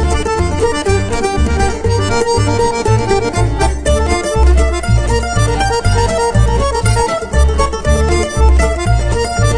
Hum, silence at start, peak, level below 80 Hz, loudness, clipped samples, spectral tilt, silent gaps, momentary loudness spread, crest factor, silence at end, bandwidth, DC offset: none; 0 s; 0 dBFS; -16 dBFS; -14 LUFS; under 0.1%; -5.5 dB/octave; none; 3 LU; 12 dB; 0 s; 10 kHz; under 0.1%